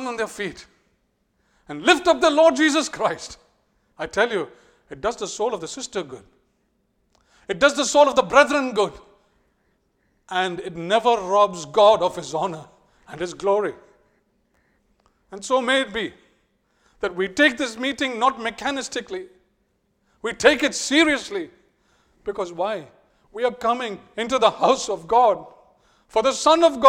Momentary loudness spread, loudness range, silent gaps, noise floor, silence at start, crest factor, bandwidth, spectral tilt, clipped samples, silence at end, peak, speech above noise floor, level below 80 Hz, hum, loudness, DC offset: 16 LU; 7 LU; none; -69 dBFS; 0 s; 22 dB; 14.5 kHz; -3 dB/octave; under 0.1%; 0 s; 0 dBFS; 48 dB; -56 dBFS; none; -21 LUFS; under 0.1%